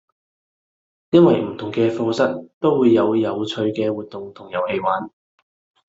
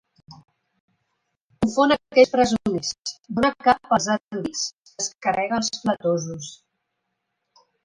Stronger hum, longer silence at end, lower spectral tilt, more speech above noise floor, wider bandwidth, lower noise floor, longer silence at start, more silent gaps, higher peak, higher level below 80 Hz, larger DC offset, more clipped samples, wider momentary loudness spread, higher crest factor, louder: neither; second, 0.8 s vs 1.3 s; first, -7.5 dB/octave vs -4 dB/octave; first, over 71 dB vs 56 dB; second, 7.8 kHz vs 11 kHz; first, under -90 dBFS vs -78 dBFS; first, 1.1 s vs 0.3 s; second, 2.54-2.61 s vs 0.80-0.88 s, 1.42-1.50 s, 3.20-3.24 s, 4.23-4.29 s, 4.73-4.83 s, 5.15-5.19 s; about the same, -2 dBFS vs -4 dBFS; second, -62 dBFS vs -54 dBFS; neither; neither; about the same, 13 LU vs 12 LU; about the same, 18 dB vs 20 dB; first, -19 LUFS vs -22 LUFS